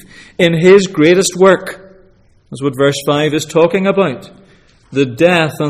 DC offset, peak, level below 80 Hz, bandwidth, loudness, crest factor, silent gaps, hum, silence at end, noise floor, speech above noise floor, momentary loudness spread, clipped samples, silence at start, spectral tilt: under 0.1%; 0 dBFS; -50 dBFS; 15 kHz; -12 LUFS; 12 dB; none; none; 0 s; -48 dBFS; 36 dB; 13 LU; under 0.1%; 0.4 s; -5 dB/octave